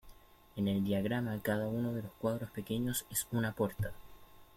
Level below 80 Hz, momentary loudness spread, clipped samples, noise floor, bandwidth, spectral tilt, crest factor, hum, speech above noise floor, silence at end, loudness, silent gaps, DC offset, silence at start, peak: -58 dBFS; 6 LU; under 0.1%; -57 dBFS; 16.5 kHz; -5.5 dB/octave; 16 dB; none; 22 dB; 0.15 s; -36 LUFS; none; under 0.1%; 0.05 s; -20 dBFS